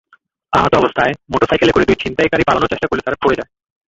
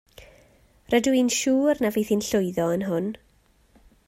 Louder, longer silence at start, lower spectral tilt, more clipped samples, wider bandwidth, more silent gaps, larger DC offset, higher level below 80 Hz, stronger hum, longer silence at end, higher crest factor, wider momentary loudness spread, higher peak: first, -15 LUFS vs -23 LUFS; first, 0.5 s vs 0.2 s; about the same, -5.5 dB/octave vs -4.5 dB/octave; neither; second, 8 kHz vs 16 kHz; neither; neither; first, -38 dBFS vs -58 dBFS; neither; second, 0.45 s vs 0.9 s; about the same, 16 dB vs 18 dB; about the same, 6 LU vs 7 LU; first, 0 dBFS vs -8 dBFS